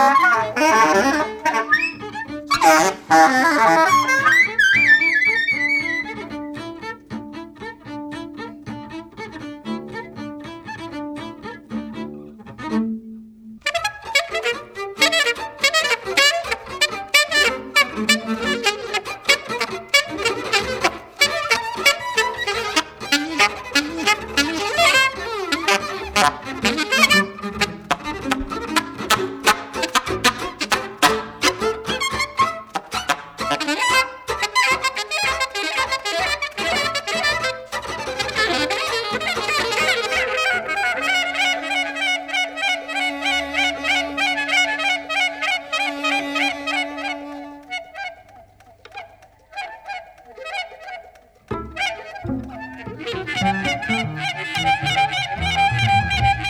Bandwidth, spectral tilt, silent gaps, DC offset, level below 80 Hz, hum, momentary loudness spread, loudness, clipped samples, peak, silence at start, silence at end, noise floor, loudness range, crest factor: over 20 kHz; -2.5 dB/octave; none; under 0.1%; -46 dBFS; none; 18 LU; -18 LUFS; under 0.1%; 0 dBFS; 0 s; 0 s; -48 dBFS; 16 LU; 20 dB